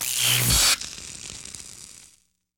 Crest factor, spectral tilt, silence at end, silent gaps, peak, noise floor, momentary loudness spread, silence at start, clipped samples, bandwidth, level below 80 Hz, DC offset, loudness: 18 dB; -1 dB/octave; 0.65 s; none; -8 dBFS; -61 dBFS; 22 LU; 0 s; under 0.1%; over 20 kHz; -40 dBFS; under 0.1%; -19 LUFS